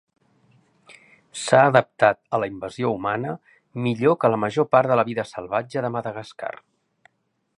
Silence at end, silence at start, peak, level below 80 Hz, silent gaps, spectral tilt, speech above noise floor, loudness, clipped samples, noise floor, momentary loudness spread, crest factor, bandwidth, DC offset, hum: 1.1 s; 1.35 s; 0 dBFS; -64 dBFS; none; -6 dB/octave; 49 dB; -22 LUFS; under 0.1%; -70 dBFS; 16 LU; 22 dB; 11 kHz; under 0.1%; none